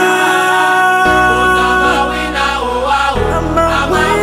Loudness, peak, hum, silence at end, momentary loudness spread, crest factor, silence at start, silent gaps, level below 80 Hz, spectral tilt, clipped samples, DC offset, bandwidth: -11 LUFS; 0 dBFS; none; 0 s; 5 LU; 12 dB; 0 s; none; -28 dBFS; -4 dB/octave; under 0.1%; under 0.1%; 16 kHz